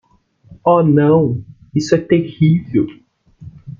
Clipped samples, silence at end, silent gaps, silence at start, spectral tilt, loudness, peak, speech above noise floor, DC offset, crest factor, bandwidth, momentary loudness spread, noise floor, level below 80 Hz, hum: under 0.1%; 0.1 s; none; 0.5 s; -8 dB/octave; -15 LUFS; -2 dBFS; 35 dB; under 0.1%; 14 dB; 7.4 kHz; 11 LU; -48 dBFS; -50 dBFS; none